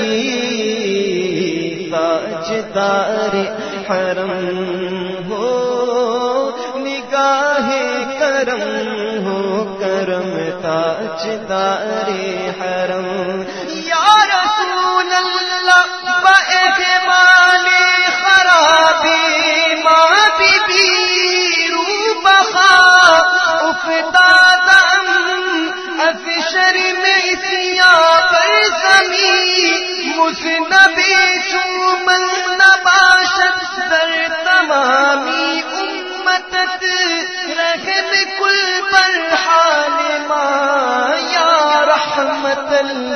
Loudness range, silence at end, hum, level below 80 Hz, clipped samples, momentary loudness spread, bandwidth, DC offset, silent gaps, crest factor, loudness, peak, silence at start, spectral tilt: 9 LU; 0 s; none; -56 dBFS; under 0.1%; 12 LU; 10.5 kHz; 0.2%; none; 14 dB; -12 LUFS; 0 dBFS; 0 s; -2 dB/octave